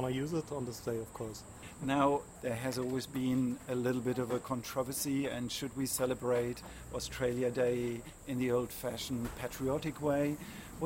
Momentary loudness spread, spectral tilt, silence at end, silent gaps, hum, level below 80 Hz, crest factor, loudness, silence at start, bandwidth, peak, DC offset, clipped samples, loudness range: 9 LU; -5 dB/octave; 0 s; none; none; -58 dBFS; 20 dB; -36 LUFS; 0 s; 16 kHz; -16 dBFS; under 0.1%; under 0.1%; 1 LU